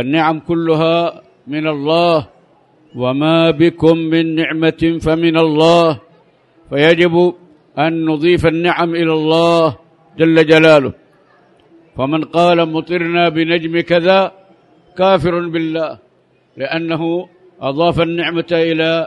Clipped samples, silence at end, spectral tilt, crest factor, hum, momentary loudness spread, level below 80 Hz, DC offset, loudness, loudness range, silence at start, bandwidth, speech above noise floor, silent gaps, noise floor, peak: under 0.1%; 0 s; -7 dB/octave; 14 dB; none; 11 LU; -44 dBFS; under 0.1%; -14 LUFS; 5 LU; 0 s; 10.5 kHz; 41 dB; none; -54 dBFS; 0 dBFS